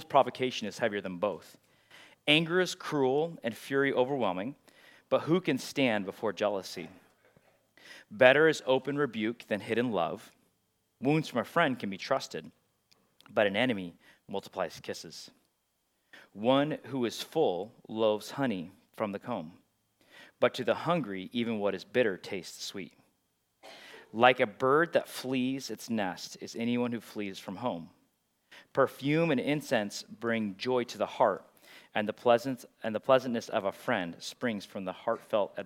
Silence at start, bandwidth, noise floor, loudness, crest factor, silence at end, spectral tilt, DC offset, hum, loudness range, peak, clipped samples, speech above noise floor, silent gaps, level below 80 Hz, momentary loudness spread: 0 s; 16.5 kHz; -77 dBFS; -31 LUFS; 26 dB; 0 s; -5 dB/octave; under 0.1%; none; 6 LU; -6 dBFS; under 0.1%; 47 dB; none; -82 dBFS; 14 LU